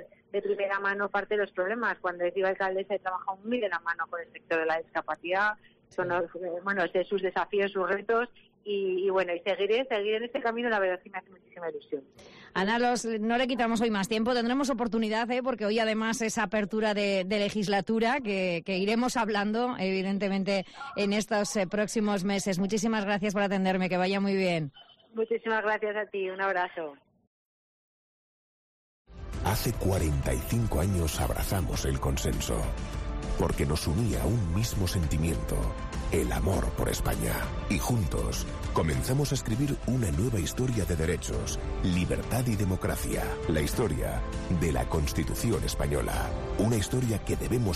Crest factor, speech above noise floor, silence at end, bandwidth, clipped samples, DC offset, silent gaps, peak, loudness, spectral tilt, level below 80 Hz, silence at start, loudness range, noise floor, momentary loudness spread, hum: 12 dB; over 61 dB; 0 s; 14.5 kHz; under 0.1%; under 0.1%; 27.27-29.05 s; -16 dBFS; -29 LUFS; -5.5 dB/octave; -38 dBFS; 0 s; 3 LU; under -90 dBFS; 6 LU; none